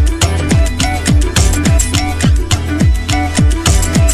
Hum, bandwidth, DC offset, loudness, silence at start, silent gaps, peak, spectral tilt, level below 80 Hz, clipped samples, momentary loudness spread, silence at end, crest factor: none; 14 kHz; under 0.1%; -13 LUFS; 0 s; none; 0 dBFS; -4.5 dB/octave; -14 dBFS; under 0.1%; 3 LU; 0 s; 10 dB